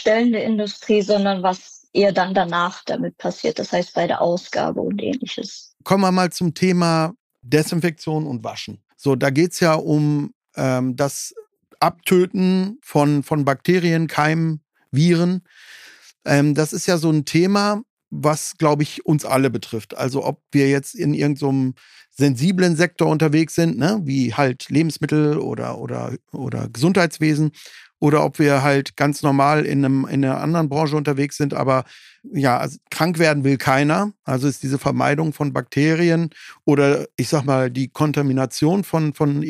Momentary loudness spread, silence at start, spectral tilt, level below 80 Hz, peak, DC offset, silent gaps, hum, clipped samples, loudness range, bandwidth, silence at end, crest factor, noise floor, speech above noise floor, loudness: 9 LU; 0 s; -6 dB/octave; -60 dBFS; -2 dBFS; under 0.1%; 7.20-7.30 s, 10.35-10.41 s, 17.90-17.97 s; none; under 0.1%; 3 LU; 15.5 kHz; 0 s; 18 dB; -46 dBFS; 27 dB; -19 LUFS